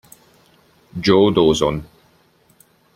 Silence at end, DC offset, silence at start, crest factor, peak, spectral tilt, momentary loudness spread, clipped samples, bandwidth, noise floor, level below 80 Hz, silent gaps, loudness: 1.1 s; under 0.1%; 0.95 s; 18 dB; -2 dBFS; -5.5 dB/octave; 16 LU; under 0.1%; 14.5 kHz; -56 dBFS; -46 dBFS; none; -16 LUFS